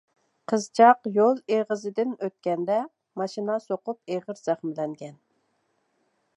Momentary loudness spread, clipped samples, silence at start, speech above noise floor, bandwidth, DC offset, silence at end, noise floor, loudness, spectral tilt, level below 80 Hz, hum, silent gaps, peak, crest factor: 15 LU; under 0.1%; 0.5 s; 47 dB; 11 kHz; under 0.1%; 1.25 s; -72 dBFS; -25 LUFS; -5.5 dB/octave; -84 dBFS; none; none; -4 dBFS; 22 dB